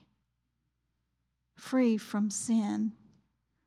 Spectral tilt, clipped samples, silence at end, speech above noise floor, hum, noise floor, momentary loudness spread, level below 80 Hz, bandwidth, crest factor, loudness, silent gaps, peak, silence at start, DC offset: -5 dB/octave; under 0.1%; 0.7 s; 51 dB; none; -81 dBFS; 8 LU; -80 dBFS; 13 kHz; 16 dB; -31 LUFS; none; -18 dBFS; 1.6 s; under 0.1%